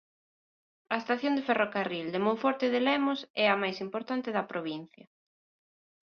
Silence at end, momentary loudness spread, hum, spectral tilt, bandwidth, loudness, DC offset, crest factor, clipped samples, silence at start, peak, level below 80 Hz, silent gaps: 1.25 s; 9 LU; none; -6 dB/octave; 6.6 kHz; -30 LUFS; under 0.1%; 20 dB; under 0.1%; 0.9 s; -12 dBFS; -78 dBFS; 3.30-3.34 s